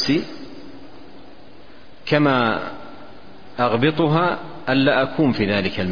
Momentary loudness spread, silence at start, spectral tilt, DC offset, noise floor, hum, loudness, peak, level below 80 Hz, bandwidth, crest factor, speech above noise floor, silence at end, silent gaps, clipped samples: 21 LU; 0 s; -6.5 dB/octave; 2%; -46 dBFS; none; -19 LUFS; -4 dBFS; -50 dBFS; 5.2 kHz; 18 dB; 27 dB; 0 s; none; under 0.1%